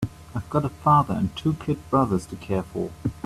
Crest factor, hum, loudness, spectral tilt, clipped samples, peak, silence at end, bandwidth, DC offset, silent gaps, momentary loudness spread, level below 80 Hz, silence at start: 20 dB; none; -24 LUFS; -8 dB/octave; under 0.1%; -6 dBFS; 0 s; 13.5 kHz; under 0.1%; none; 11 LU; -48 dBFS; 0 s